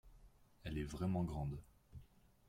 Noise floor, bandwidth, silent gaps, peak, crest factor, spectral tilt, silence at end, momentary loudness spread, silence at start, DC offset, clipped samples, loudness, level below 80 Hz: -66 dBFS; 15.5 kHz; none; -28 dBFS; 16 dB; -7.5 dB/octave; 0.45 s; 21 LU; 0.05 s; under 0.1%; under 0.1%; -44 LUFS; -56 dBFS